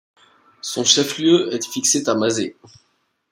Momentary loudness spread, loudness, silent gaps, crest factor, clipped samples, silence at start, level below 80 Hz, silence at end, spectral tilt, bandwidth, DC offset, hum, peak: 12 LU; -18 LUFS; none; 20 dB; under 0.1%; 0.65 s; -66 dBFS; 0.8 s; -2.5 dB/octave; 16.5 kHz; under 0.1%; none; 0 dBFS